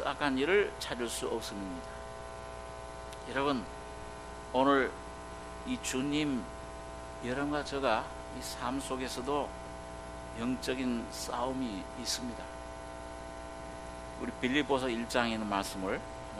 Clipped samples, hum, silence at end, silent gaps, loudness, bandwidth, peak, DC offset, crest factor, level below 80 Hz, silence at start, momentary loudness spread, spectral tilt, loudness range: under 0.1%; 60 Hz at -50 dBFS; 0 s; none; -35 LUFS; 13 kHz; -12 dBFS; under 0.1%; 24 dB; -52 dBFS; 0 s; 14 LU; -4 dB/octave; 4 LU